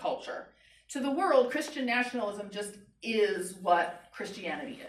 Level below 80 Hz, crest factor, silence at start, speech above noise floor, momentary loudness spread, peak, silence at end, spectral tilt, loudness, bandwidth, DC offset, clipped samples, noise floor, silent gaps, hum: -72 dBFS; 20 dB; 0 s; 24 dB; 15 LU; -12 dBFS; 0 s; -3.5 dB/octave; -31 LUFS; 14.5 kHz; under 0.1%; under 0.1%; -55 dBFS; none; none